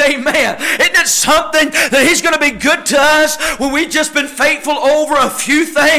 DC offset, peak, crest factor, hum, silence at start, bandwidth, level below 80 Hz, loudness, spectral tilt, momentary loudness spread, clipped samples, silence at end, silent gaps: under 0.1%; -4 dBFS; 8 dB; none; 0 s; 16 kHz; -42 dBFS; -11 LUFS; -1 dB/octave; 4 LU; under 0.1%; 0 s; none